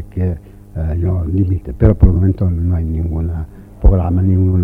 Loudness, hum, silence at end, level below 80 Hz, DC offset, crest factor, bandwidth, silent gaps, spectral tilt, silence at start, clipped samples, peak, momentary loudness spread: -16 LUFS; none; 0 s; -20 dBFS; under 0.1%; 14 dB; 2.7 kHz; none; -12 dB/octave; 0 s; under 0.1%; 0 dBFS; 12 LU